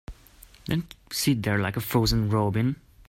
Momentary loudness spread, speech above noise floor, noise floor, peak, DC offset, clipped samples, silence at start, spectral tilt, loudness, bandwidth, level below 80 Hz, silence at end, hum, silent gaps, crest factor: 7 LU; 27 dB; -52 dBFS; -10 dBFS; under 0.1%; under 0.1%; 0.1 s; -5.5 dB/octave; -26 LUFS; 16.5 kHz; -42 dBFS; 0.35 s; none; none; 18 dB